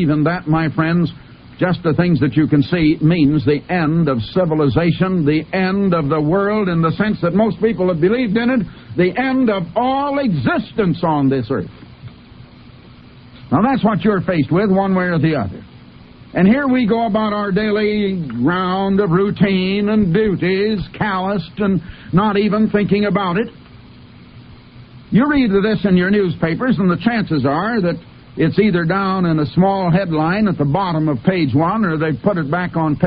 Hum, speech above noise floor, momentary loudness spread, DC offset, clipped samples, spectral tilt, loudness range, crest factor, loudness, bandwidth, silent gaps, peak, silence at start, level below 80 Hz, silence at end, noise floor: none; 25 dB; 5 LU; under 0.1%; under 0.1%; -11.5 dB/octave; 3 LU; 14 dB; -16 LUFS; 5.2 kHz; none; -2 dBFS; 0 s; -42 dBFS; 0 s; -41 dBFS